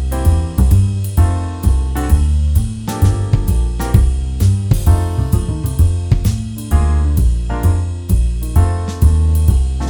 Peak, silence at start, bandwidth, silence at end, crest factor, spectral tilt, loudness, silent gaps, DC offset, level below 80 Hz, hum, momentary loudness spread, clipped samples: 0 dBFS; 0 s; 19 kHz; 0 s; 14 dB; -7 dB/octave; -15 LUFS; none; under 0.1%; -16 dBFS; none; 4 LU; under 0.1%